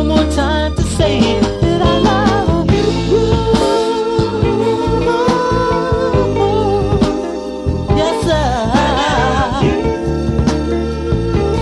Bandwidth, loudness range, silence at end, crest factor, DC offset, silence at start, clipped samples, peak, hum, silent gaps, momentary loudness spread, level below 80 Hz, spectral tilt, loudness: 12 kHz; 2 LU; 0 s; 12 dB; under 0.1%; 0 s; under 0.1%; 0 dBFS; none; none; 4 LU; -24 dBFS; -6 dB/octave; -14 LUFS